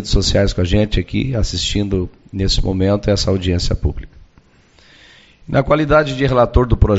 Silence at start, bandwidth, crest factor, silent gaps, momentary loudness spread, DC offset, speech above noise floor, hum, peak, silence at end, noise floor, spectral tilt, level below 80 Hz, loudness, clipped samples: 0 s; 8.2 kHz; 16 dB; none; 7 LU; under 0.1%; 35 dB; none; 0 dBFS; 0 s; -50 dBFS; -5.5 dB/octave; -24 dBFS; -17 LUFS; under 0.1%